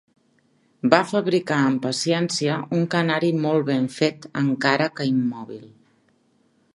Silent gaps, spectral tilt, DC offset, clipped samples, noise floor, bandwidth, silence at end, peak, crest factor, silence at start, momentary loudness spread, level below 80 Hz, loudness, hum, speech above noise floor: none; -5.5 dB/octave; under 0.1%; under 0.1%; -63 dBFS; 11.5 kHz; 1.1 s; 0 dBFS; 22 dB; 0.85 s; 6 LU; -70 dBFS; -22 LUFS; none; 41 dB